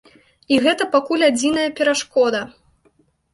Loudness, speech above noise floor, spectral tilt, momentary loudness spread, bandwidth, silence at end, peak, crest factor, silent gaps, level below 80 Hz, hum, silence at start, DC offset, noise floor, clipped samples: -18 LUFS; 42 dB; -2.5 dB/octave; 4 LU; 11.5 kHz; 0.85 s; -4 dBFS; 16 dB; none; -58 dBFS; none; 0.5 s; under 0.1%; -60 dBFS; under 0.1%